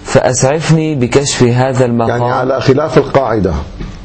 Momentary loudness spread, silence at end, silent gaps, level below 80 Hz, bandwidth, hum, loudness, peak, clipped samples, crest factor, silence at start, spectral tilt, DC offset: 4 LU; 0 s; none; -30 dBFS; 8.8 kHz; none; -12 LUFS; 0 dBFS; 0.5%; 12 dB; 0 s; -5.5 dB/octave; under 0.1%